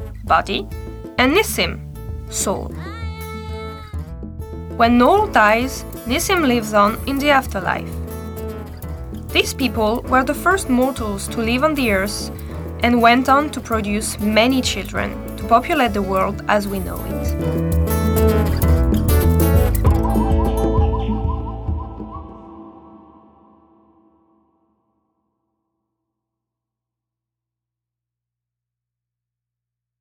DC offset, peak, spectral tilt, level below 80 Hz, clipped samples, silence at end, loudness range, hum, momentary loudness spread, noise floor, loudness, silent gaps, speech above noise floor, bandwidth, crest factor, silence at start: under 0.1%; -2 dBFS; -5 dB/octave; -28 dBFS; under 0.1%; 7.05 s; 6 LU; 60 Hz at -50 dBFS; 16 LU; -85 dBFS; -18 LUFS; none; 67 dB; over 20 kHz; 18 dB; 0 s